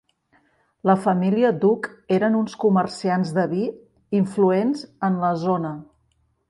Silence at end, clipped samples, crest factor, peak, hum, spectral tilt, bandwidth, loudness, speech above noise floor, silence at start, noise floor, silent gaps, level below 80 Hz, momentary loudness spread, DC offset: 0.65 s; under 0.1%; 18 dB; -4 dBFS; none; -7.5 dB/octave; 11 kHz; -22 LUFS; 46 dB; 0.85 s; -66 dBFS; none; -64 dBFS; 7 LU; under 0.1%